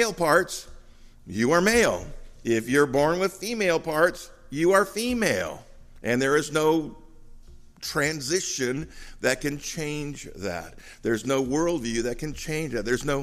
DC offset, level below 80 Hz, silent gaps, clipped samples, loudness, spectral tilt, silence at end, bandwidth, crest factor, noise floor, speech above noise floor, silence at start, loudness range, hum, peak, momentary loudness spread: under 0.1%; -46 dBFS; none; under 0.1%; -25 LUFS; -4 dB/octave; 0 s; 15.5 kHz; 20 dB; -48 dBFS; 23 dB; 0 s; 5 LU; none; -6 dBFS; 15 LU